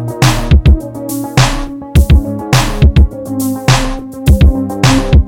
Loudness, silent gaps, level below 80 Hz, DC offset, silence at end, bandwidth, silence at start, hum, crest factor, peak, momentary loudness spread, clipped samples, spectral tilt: -12 LUFS; none; -12 dBFS; under 0.1%; 0 s; 17 kHz; 0 s; none; 10 dB; 0 dBFS; 8 LU; 0.7%; -5.5 dB/octave